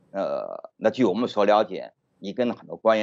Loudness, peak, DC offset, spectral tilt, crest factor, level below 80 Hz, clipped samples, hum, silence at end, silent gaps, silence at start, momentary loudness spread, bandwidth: -24 LUFS; -6 dBFS; under 0.1%; -6 dB/octave; 18 dB; -80 dBFS; under 0.1%; none; 0 s; none; 0.15 s; 16 LU; 7.6 kHz